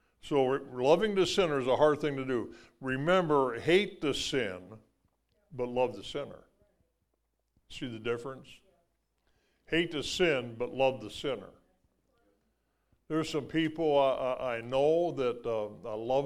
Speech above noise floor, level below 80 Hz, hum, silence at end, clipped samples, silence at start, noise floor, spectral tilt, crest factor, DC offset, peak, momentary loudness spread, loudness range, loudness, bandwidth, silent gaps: 49 dB; -60 dBFS; none; 0 s; under 0.1%; 0.25 s; -79 dBFS; -5 dB/octave; 20 dB; under 0.1%; -10 dBFS; 13 LU; 11 LU; -31 LUFS; 14 kHz; none